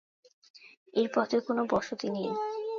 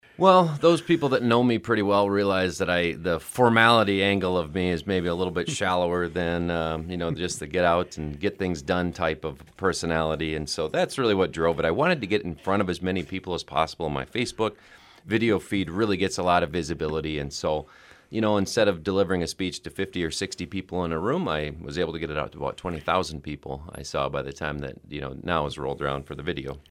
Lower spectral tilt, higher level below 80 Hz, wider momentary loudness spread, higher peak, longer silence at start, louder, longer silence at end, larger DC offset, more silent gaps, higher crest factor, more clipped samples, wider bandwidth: about the same, -5.5 dB/octave vs -5 dB/octave; second, -68 dBFS vs -48 dBFS; second, 6 LU vs 10 LU; second, -14 dBFS vs -2 dBFS; first, 0.55 s vs 0.2 s; second, -31 LUFS vs -25 LUFS; about the same, 0 s vs 0.1 s; neither; first, 0.77-0.86 s vs none; about the same, 18 dB vs 22 dB; neither; second, 7.4 kHz vs 15.5 kHz